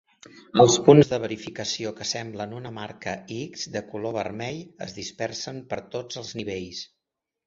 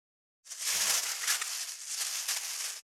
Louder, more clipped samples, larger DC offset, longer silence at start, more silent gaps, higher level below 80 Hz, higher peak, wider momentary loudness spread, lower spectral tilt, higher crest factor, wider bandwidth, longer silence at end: first, -25 LUFS vs -31 LUFS; neither; neither; about the same, 0.35 s vs 0.45 s; neither; first, -60 dBFS vs -86 dBFS; first, -2 dBFS vs -12 dBFS; first, 18 LU vs 9 LU; first, -5 dB/octave vs 4 dB/octave; about the same, 24 dB vs 22 dB; second, 7.8 kHz vs over 20 kHz; first, 0.6 s vs 0.15 s